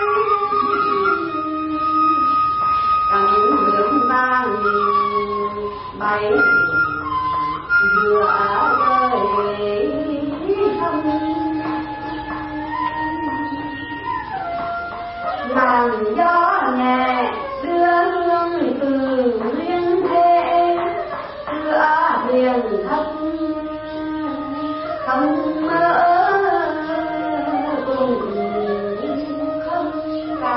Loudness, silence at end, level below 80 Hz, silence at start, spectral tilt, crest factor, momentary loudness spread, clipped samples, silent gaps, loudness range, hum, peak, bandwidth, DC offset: -19 LUFS; 0 s; -48 dBFS; 0 s; -10 dB/octave; 16 dB; 10 LU; under 0.1%; none; 6 LU; none; -4 dBFS; 5.8 kHz; under 0.1%